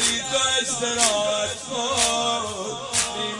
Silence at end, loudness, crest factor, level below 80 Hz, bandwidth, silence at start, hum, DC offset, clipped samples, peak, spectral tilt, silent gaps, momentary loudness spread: 0 s; -22 LUFS; 20 dB; -54 dBFS; 11.5 kHz; 0 s; none; under 0.1%; under 0.1%; -4 dBFS; -0.5 dB/octave; none; 7 LU